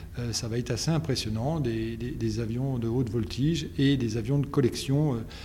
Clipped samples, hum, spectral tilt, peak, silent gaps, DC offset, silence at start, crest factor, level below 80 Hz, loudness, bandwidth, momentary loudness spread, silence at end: under 0.1%; none; -6 dB/octave; -12 dBFS; none; under 0.1%; 0 s; 16 dB; -44 dBFS; -28 LUFS; 16 kHz; 5 LU; 0 s